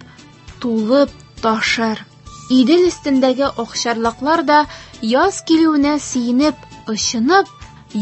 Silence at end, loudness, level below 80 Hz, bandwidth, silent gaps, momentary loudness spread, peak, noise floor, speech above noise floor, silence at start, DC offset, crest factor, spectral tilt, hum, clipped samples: 0 s; -16 LUFS; -46 dBFS; 8.6 kHz; none; 12 LU; 0 dBFS; -40 dBFS; 25 dB; 0.45 s; under 0.1%; 16 dB; -3.5 dB/octave; none; under 0.1%